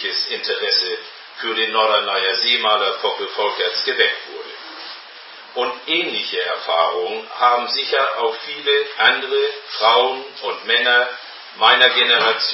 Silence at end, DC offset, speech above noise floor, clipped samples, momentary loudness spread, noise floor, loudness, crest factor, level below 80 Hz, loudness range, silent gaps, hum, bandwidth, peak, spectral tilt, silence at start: 0 s; under 0.1%; 20 dB; under 0.1%; 18 LU; -39 dBFS; -17 LUFS; 20 dB; -76 dBFS; 5 LU; none; none; 5.8 kHz; 0 dBFS; -3.5 dB/octave; 0 s